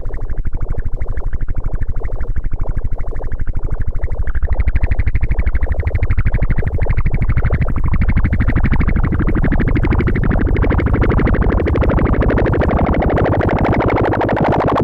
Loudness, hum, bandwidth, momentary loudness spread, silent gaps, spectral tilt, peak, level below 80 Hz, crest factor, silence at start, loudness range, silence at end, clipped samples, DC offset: -18 LUFS; none; 4.5 kHz; 10 LU; none; -10 dB/octave; -4 dBFS; -16 dBFS; 10 dB; 0 s; 10 LU; 0 s; under 0.1%; under 0.1%